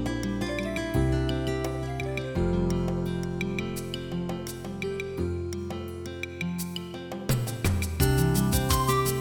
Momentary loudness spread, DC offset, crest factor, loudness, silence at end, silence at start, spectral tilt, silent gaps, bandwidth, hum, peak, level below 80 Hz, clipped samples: 11 LU; under 0.1%; 18 dB; -29 LUFS; 0 s; 0 s; -5.5 dB/octave; none; 19 kHz; none; -10 dBFS; -38 dBFS; under 0.1%